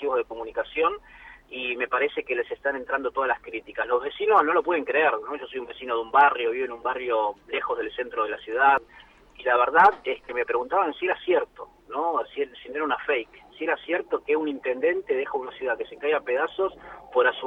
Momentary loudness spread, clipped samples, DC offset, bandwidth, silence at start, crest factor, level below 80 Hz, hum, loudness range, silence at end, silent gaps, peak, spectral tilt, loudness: 12 LU; under 0.1%; under 0.1%; 5.6 kHz; 0 s; 20 dB; -62 dBFS; none; 5 LU; 0 s; none; -6 dBFS; -5.5 dB/octave; -25 LUFS